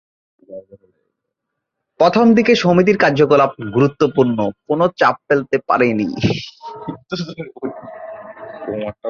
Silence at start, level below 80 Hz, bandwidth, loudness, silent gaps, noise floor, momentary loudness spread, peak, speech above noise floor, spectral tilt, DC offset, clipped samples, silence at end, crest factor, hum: 0.5 s; -52 dBFS; 7.2 kHz; -15 LUFS; none; -78 dBFS; 21 LU; 0 dBFS; 62 dB; -6.5 dB/octave; under 0.1%; under 0.1%; 0 s; 16 dB; none